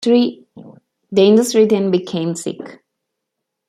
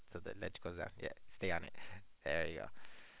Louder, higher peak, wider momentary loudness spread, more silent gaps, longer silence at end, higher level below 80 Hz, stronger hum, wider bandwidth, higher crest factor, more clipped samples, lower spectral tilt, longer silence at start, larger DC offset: first, -15 LUFS vs -44 LUFS; first, -2 dBFS vs -22 dBFS; about the same, 15 LU vs 15 LU; neither; first, 0.95 s vs 0 s; about the same, -64 dBFS vs -62 dBFS; neither; first, 14.5 kHz vs 4 kHz; about the same, 16 dB vs 20 dB; neither; first, -5.5 dB/octave vs -3.5 dB/octave; about the same, 0 s vs 0 s; neither